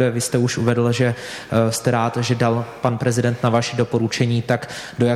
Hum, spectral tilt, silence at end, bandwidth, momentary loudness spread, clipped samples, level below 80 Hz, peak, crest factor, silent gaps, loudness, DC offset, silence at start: none; -5.5 dB/octave; 0 s; 14 kHz; 4 LU; under 0.1%; -54 dBFS; -4 dBFS; 14 dB; none; -20 LUFS; under 0.1%; 0 s